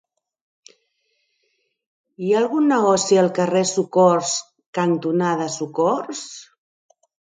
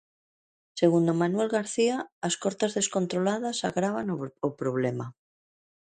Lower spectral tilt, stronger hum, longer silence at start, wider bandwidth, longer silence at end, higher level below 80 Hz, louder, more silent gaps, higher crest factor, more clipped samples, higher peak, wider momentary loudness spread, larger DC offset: about the same, -4.5 dB/octave vs -5 dB/octave; neither; first, 2.2 s vs 0.75 s; about the same, 9.6 kHz vs 9.6 kHz; about the same, 0.95 s vs 0.85 s; about the same, -70 dBFS vs -70 dBFS; first, -19 LUFS vs -28 LUFS; about the same, 4.66-4.73 s vs 2.12-2.22 s; about the same, 20 dB vs 18 dB; neither; first, -2 dBFS vs -10 dBFS; first, 14 LU vs 8 LU; neither